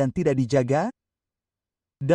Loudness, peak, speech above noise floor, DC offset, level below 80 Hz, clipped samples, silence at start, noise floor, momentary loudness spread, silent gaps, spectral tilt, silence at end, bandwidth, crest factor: -24 LUFS; -8 dBFS; 67 dB; under 0.1%; -54 dBFS; under 0.1%; 0 s; -90 dBFS; 10 LU; none; -7.5 dB/octave; 0 s; 10.5 kHz; 16 dB